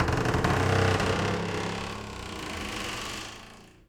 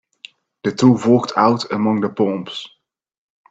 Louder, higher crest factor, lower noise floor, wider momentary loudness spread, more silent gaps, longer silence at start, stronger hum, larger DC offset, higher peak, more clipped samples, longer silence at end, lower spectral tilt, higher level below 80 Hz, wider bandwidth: second, -29 LUFS vs -17 LUFS; about the same, 18 dB vs 18 dB; first, -49 dBFS vs -44 dBFS; about the same, 13 LU vs 14 LU; neither; second, 0 s vs 0.65 s; neither; neither; second, -10 dBFS vs 0 dBFS; neither; second, 0.2 s vs 0.85 s; second, -5 dB/octave vs -6.5 dB/octave; first, -44 dBFS vs -62 dBFS; first, 17 kHz vs 7.8 kHz